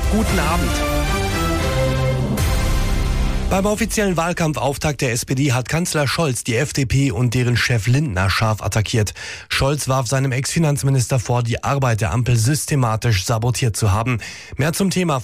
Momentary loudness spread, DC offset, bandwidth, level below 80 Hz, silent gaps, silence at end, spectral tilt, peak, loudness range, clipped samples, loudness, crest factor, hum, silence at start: 3 LU; under 0.1%; 15.5 kHz; -28 dBFS; none; 0 s; -5 dB/octave; -8 dBFS; 1 LU; under 0.1%; -19 LUFS; 10 dB; none; 0 s